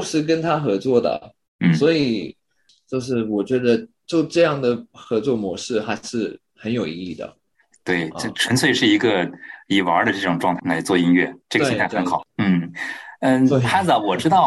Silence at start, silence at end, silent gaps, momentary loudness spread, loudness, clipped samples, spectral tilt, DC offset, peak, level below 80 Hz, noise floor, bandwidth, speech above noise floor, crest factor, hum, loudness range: 0 s; 0 s; 1.48-1.59 s; 12 LU; -20 LUFS; under 0.1%; -5.5 dB/octave; under 0.1%; -4 dBFS; -60 dBFS; -62 dBFS; 12.5 kHz; 42 dB; 16 dB; none; 5 LU